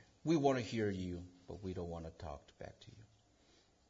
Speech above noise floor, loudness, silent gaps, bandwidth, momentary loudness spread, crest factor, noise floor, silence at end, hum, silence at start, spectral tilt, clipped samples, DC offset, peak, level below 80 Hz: 31 dB; -40 LUFS; none; 7.4 kHz; 20 LU; 22 dB; -70 dBFS; 0.85 s; none; 0.25 s; -6 dB/octave; under 0.1%; under 0.1%; -20 dBFS; -66 dBFS